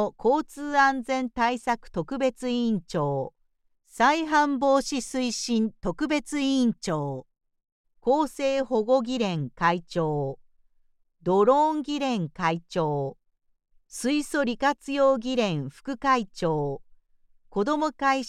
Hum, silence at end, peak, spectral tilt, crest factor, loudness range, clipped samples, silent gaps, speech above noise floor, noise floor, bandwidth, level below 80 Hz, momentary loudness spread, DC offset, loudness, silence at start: none; 0 s; -8 dBFS; -5 dB/octave; 18 dB; 2 LU; under 0.1%; 7.72-7.84 s; 39 dB; -64 dBFS; 13.5 kHz; -54 dBFS; 10 LU; under 0.1%; -26 LUFS; 0 s